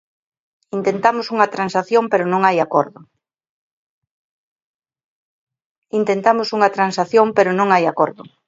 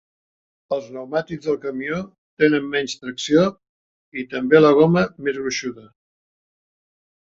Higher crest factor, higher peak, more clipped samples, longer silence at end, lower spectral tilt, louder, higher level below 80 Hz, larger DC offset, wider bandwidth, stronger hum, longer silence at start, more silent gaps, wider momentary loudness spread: about the same, 18 dB vs 20 dB; about the same, 0 dBFS vs -2 dBFS; neither; second, 0.25 s vs 1.4 s; about the same, -5.5 dB/octave vs -5.5 dB/octave; first, -17 LUFS vs -20 LUFS; second, -68 dBFS vs -58 dBFS; neither; about the same, 7.8 kHz vs 7.8 kHz; neither; about the same, 0.75 s vs 0.7 s; first, 3.49-4.02 s, 4.11-4.56 s, 4.62-4.80 s, 5.04-5.47 s, 5.65-5.82 s vs 2.18-2.37 s, 3.69-4.12 s; second, 6 LU vs 15 LU